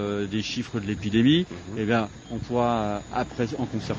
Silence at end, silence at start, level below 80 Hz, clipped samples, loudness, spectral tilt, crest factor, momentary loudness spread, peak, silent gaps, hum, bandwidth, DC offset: 0 s; 0 s; -48 dBFS; under 0.1%; -26 LUFS; -6 dB/octave; 18 dB; 9 LU; -8 dBFS; none; none; 9.6 kHz; under 0.1%